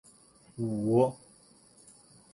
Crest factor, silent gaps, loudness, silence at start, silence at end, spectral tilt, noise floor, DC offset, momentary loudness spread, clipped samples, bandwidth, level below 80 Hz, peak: 22 dB; none; -29 LUFS; 0.55 s; 1.2 s; -8.5 dB/octave; -60 dBFS; under 0.1%; 24 LU; under 0.1%; 11.5 kHz; -68 dBFS; -12 dBFS